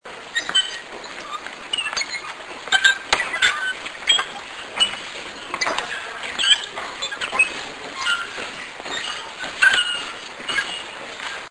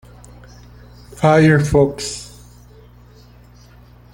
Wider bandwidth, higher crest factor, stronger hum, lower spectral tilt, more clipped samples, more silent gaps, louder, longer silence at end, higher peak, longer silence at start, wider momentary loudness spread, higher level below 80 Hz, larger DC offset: second, 10.5 kHz vs 16 kHz; first, 24 dB vs 18 dB; second, none vs 60 Hz at -40 dBFS; second, 1 dB/octave vs -6 dB/octave; neither; neither; second, -21 LUFS vs -15 LUFS; second, 0 s vs 1.9 s; about the same, 0 dBFS vs -2 dBFS; second, 0.05 s vs 1.15 s; second, 15 LU vs 18 LU; second, -58 dBFS vs -40 dBFS; neither